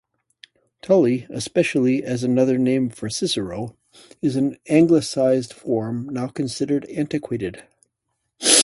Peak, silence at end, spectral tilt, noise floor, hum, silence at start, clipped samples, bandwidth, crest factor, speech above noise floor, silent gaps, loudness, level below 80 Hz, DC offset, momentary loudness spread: 0 dBFS; 0 s; -4 dB/octave; -76 dBFS; none; 0.85 s; under 0.1%; 11.5 kHz; 22 dB; 55 dB; none; -21 LUFS; -58 dBFS; under 0.1%; 10 LU